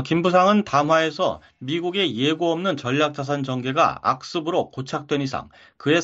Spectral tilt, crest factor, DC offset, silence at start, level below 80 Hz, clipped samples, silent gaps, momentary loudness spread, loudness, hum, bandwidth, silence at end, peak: -5.5 dB/octave; 18 dB; under 0.1%; 0 s; -60 dBFS; under 0.1%; none; 11 LU; -22 LUFS; none; 8 kHz; 0 s; -4 dBFS